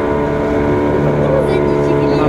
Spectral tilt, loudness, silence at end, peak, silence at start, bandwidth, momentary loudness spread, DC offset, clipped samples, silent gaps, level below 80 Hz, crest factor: -8.5 dB/octave; -14 LUFS; 0 s; 0 dBFS; 0 s; 11.5 kHz; 2 LU; under 0.1%; under 0.1%; none; -30 dBFS; 12 dB